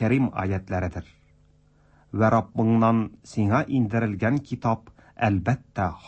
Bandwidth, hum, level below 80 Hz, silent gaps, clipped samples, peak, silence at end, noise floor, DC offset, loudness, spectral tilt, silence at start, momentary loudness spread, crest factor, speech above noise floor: 8.6 kHz; none; -50 dBFS; none; under 0.1%; -8 dBFS; 0 s; -59 dBFS; under 0.1%; -25 LUFS; -8.5 dB/octave; 0 s; 9 LU; 16 dB; 35 dB